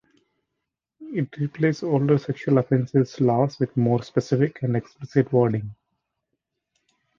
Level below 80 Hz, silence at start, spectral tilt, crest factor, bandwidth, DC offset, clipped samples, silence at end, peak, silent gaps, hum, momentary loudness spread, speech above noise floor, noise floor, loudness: -62 dBFS; 1 s; -8.5 dB/octave; 18 dB; 7.2 kHz; under 0.1%; under 0.1%; 1.45 s; -6 dBFS; none; none; 8 LU; 60 dB; -82 dBFS; -23 LUFS